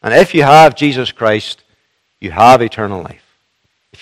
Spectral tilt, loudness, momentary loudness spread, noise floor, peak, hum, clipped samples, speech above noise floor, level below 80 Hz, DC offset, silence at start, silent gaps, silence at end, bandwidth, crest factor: -5.5 dB/octave; -10 LUFS; 20 LU; -63 dBFS; 0 dBFS; none; 2%; 54 dB; -46 dBFS; under 0.1%; 0.05 s; none; 0.9 s; 16 kHz; 12 dB